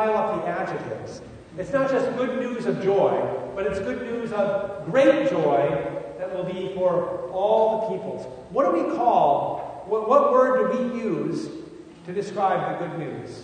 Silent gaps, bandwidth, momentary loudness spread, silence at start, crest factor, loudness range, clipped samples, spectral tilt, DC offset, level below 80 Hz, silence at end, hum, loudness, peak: none; 9.6 kHz; 14 LU; 0 s; 18 dB; 3 LU; under 0.1%; -7 dB/octave; under 0.1%; -58 dBFS; 0 s; none; -24 LUFS; -6 dBFS